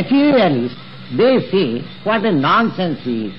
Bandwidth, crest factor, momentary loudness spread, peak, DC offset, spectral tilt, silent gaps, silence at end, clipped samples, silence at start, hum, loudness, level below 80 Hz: 6 kHz; 10 dB; 10 LU; -6 dBFS; 1%; -9 dB/octave; none; 0 s; under 0.1%; 0 s; none; -16 LUFS; -58 dBFS